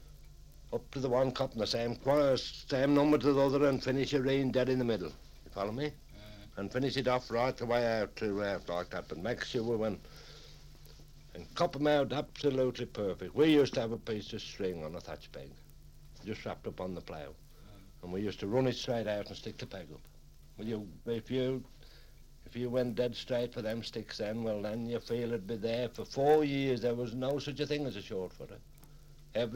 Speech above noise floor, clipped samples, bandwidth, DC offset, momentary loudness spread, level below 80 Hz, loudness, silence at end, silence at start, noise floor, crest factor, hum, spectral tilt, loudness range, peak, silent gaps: 21 dB; under 0.1%; 16.5 kHz; under 0.1%; 18 LU; -54 dBFS; -34 LUFS; 0 s; 0 s; -54 dBFS; 20 dB; 50 Hz at -60 dBFS; -6 dB/octave; 10 LU; -14 dBFS; none